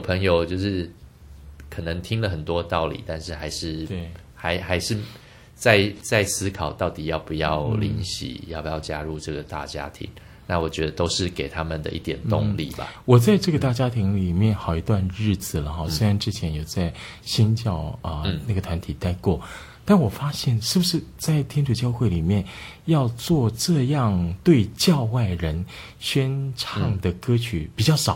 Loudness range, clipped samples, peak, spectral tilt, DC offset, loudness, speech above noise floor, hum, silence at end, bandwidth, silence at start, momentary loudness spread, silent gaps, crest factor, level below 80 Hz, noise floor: 6 LU; under 0.1%; -2 dBFS; -5.5 dB/octave; under 0.1%; -24 LUFS; 21 dB; none; 0 s; 16.5 kHz; 0 s; 12 LU; none; 22 dB; -40 dBFS; -44 dBFS